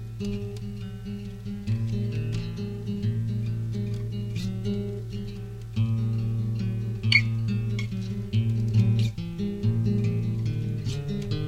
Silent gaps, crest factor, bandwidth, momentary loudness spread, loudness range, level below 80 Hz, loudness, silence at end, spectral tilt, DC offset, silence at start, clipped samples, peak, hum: none; 22 dB; 8.4 kHz; 12 LU; 5 LU; -44 dBFS; -28 LUFS; 0 s; -7 dB/octave; under 0.1%; 0 s; under 0.1%; -6 dBFS; none